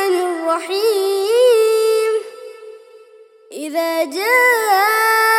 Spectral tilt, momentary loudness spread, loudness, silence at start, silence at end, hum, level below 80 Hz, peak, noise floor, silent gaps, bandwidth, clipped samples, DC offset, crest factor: 0 dB/octave; 17 LU; -15 LUFS; 0 s; 0 s; none; -76 dBFS; -2 dBFS; -45 dBFS; none; 18 kHz; under 0.1%; under 0.1%; 14 dB